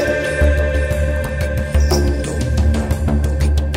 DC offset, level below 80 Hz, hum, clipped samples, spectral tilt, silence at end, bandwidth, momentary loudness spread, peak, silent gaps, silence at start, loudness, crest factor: under 0.1%; -18 dBFS; none; under 0.1%; -6 dB/octave; 0 s; 15.5 kHz; 4 LU; -4 dBFS; none; 0 s; -18 LUFS; 12 dB